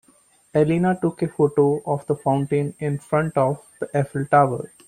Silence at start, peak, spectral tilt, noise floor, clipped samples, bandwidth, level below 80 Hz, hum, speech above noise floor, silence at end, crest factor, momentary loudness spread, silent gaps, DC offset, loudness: 0.55 s; -4 dBFS; -8 dB/octave; -57 dBFS; under 0.1%; 11.5 kHz; -56 dBFS; none; 37 dB; 0.2 s; 18 dB; 7 LU; none; under 0.1%; -22 LUFS